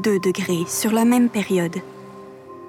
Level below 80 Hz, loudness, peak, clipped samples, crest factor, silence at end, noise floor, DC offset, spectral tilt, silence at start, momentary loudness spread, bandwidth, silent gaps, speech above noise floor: -64 dBFS; -20 LUFS; -8 dBFS; under 0.1%; 14 dB; 0 s; -40 dBFS; under 0.1%; -5 dB/octave; 0 s; 23 LU; 17.5 kHz; none; 20 dB